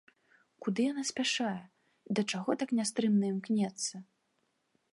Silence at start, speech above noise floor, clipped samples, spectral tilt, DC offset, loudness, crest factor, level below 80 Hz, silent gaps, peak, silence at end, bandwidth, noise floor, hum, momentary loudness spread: 0.6 s; 46 dB; under 0.1%; -4 dB/octave; under 0.1%; -33 LUFS; 18 dB; -84 dBFS; none; -16 dBFS; 0.9 s; 11.5 kHz; -78 dBFS; none; 8 LU